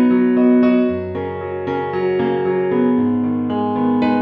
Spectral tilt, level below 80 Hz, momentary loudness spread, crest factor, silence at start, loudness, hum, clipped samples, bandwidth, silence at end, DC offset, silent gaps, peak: -10 dB/octave; -54 dBFS; 10 LU; 12 dB; 0 s; -17 LUFS; none; under 0.1%; 4.9 kHz; 0 s; under 0.1%; none; -4 dBFS